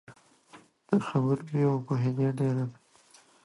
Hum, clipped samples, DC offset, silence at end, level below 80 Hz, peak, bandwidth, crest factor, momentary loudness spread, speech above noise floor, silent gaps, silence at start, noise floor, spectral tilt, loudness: none; under 0.1%; under 0.1%; 0.7 s; -72 dBFS; -10 dBFS; 11.5 kHz; 18 dB; 3 LU; 33 dB; none; 0.1 s; -60 dBFS; -9 dB/octave; -29 LUFS